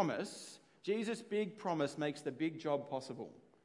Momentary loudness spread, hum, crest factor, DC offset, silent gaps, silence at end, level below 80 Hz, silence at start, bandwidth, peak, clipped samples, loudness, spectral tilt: 11 LU; none; 18 dB; under 0.1%; none; 0.25 s; under -90 dBFS; 0 s; 11.5 kHz; -20 dBFS; under 0.1%; -40 LUFS; -5.5 dB/octave